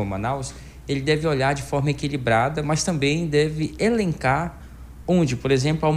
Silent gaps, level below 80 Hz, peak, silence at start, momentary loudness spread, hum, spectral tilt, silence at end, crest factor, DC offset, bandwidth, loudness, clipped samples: none; -42 dBFS; -6 dBFS; 0 s; 11 LU; none; -5.5 dB/octave; 0 s; 16 dB; under 0.1%; 14.5 kHz; -22 LUFS; under 0.1%